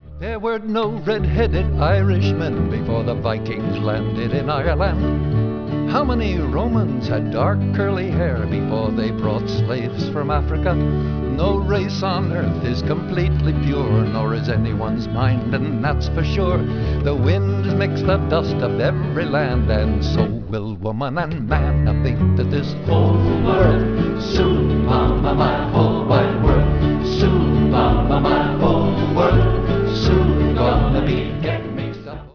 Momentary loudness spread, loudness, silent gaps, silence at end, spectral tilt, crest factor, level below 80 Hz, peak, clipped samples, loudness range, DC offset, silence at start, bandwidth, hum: 6 LU; -19 LUFS; none; 0.05 s; -8.5 dB/octave; 16 dB; -26 dBFS; 0 dBFS; under 0.1%; 4 LU; 0.3%; 0 s; 5.4 kHz; none